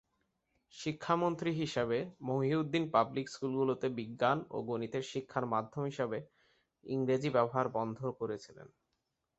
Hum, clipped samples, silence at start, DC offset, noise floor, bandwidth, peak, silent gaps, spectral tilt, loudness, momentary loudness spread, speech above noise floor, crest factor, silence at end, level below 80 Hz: none; under 0.1%; 0.75 s; under 0.1%; -84 dBFS; 8 kHz; -14 dBFS; none; -5.5 dB/octave; -35 LUFS; 9 LU; 50 dB; 20 dB; 0.7 s; -72 dBFS